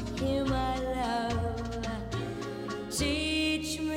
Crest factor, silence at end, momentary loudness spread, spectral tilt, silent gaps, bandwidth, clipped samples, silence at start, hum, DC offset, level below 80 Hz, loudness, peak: 12 dB; 0 s; 8 LU; -4.5 dB/octave; none; 16 kHz; under 0.1%; 0 s; none; under 0.1%; -42 dBFS; -31 LUFS; -18 dBFS